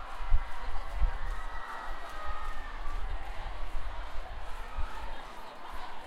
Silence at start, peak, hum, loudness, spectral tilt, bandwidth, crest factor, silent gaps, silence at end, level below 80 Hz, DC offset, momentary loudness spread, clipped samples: 0 s; -12 dBFS; none; -41 LUFS; -5 dB/octave; 6.6 kHz; 18 dB; none; 0 s; -34 dBFS; under 0.1%; 8 LU; under 0.1%